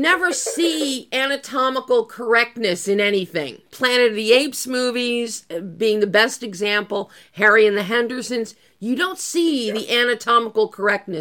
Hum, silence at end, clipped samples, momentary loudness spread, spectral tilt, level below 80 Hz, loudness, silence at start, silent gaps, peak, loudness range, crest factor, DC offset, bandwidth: none; 0 s; under 0.1%; 10 LU; -2.5 dB/octave; -72 dBFS; -19 LUFS; 0 s; none; -2 dBFS; 2 LU; 18 dB; under 0.1%; 17.5 kHz